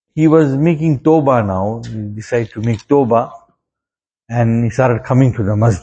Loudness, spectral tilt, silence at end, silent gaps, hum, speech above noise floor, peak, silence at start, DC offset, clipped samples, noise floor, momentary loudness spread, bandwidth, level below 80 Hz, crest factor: -14 LUFS; -8.5 dB/octave; 0 s; none; none; 75 dB; 0 dBFS; 0.15 s; under 0.1%; under 0.1%; -88 dBFS; 10 LU; 8.6 kHz; -44 dBFS; 14 dB